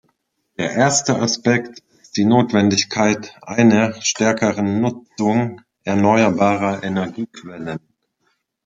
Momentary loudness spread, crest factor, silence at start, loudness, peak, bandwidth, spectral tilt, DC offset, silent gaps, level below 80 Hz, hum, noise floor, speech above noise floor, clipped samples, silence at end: 15 LU; 18 dB; 0.6 s; -18 LUFS; -2 dBFS; 9.4 kHz; -4.5 dB/octave; under 0.1%; none; -60 dBFS; none; -69 dBFS; 51 dB; under 0.1%; 0.85 s